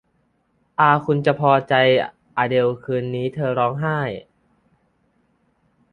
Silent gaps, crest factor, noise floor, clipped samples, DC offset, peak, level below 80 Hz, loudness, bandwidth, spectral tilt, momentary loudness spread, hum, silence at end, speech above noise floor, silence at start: none; 20 dB; -66 dBFS; under 0.1%; under 0.1%; -2 dBFS; -60 dBFS; -20 LUFS; 9.2 kHz; -8 dB/octave; 10 LU; none; 1.7 s; 47 dB; 0.8 s